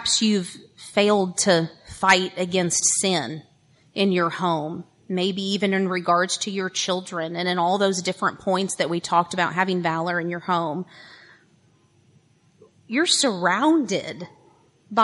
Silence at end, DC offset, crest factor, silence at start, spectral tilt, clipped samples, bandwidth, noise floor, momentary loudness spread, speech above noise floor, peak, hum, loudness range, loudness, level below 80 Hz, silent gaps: 0 s; under 0.1%; 20 dB; 0 s; -3.5 dB/octave; under 0.1%; 11.5 kHz; -59 dBFS; 13 LU; 37 dB; -2 dBFS; none; 5 LU; -22 LUFS; -64 dBFS; none